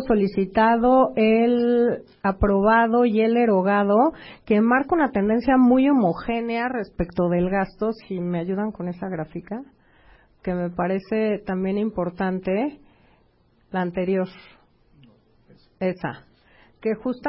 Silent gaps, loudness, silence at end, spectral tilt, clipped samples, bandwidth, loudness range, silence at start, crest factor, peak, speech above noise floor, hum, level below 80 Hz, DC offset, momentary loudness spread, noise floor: none; -22 LUFS; 0 s; -12 dB/octave; under 0.1%; 5.8 kHz; 11 LU; 0 s; 14 dB; -8 dBFS; 40 dB; none; -44 dBFS; under 0.1%; 13 LU; -61 dBFS